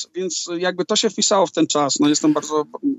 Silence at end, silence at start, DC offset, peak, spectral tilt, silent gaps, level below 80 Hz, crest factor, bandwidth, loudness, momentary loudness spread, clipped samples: 0 s; 0 s; under 0.1%; -4 dBFS; -3 dB/octave; none; -76 dBFS; 14 dB; 8.4 kHz; -19 LUFS; 7 LU; under 0.1%